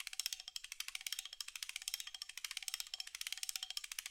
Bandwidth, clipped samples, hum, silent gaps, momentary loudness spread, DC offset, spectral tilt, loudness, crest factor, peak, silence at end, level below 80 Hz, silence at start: 17 kHz; under 0.1%; none; none; 4 LU; under 0.1%; 5.5 dB/octave; -44 LUFS; 32 dB; -16 dBFS; 0 s; -78 dBFS; 0 s